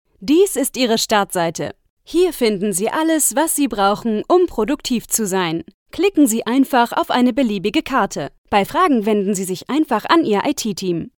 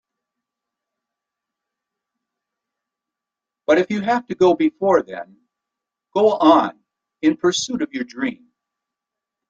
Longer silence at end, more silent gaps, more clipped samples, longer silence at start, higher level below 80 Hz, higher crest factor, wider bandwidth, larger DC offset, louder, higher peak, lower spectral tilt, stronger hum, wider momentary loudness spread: second, 0.1 s vs 1.15 s; first, 1.90-1.97 s, 5.74-5.86 s, 8.38-8.44 s vs none; neither; second, 0.2 s vs 3.7 s; first, -48 dBFS vs -64 dBFS; about the same, 18 dB vs 20 dB; first, 18 kHz vs 9 kHz; neither; about the same, -17 LUFS vs -19 LUFS; about the same, 0 dBFS vs -2 dBFS; about the same, -3.5 dB/octave vs -4.5 dB/octave; neither; second, 7 LU vs 12 LU